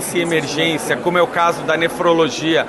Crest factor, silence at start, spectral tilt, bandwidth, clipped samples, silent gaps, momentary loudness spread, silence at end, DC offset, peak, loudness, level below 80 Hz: 14 dB; 0 s; -4 dB/octave; 13 kHz; under 0.1%; none; 3 LU; 0 s; under 0.1%; -4 dBFS; -16 LUFS; -52 dBFS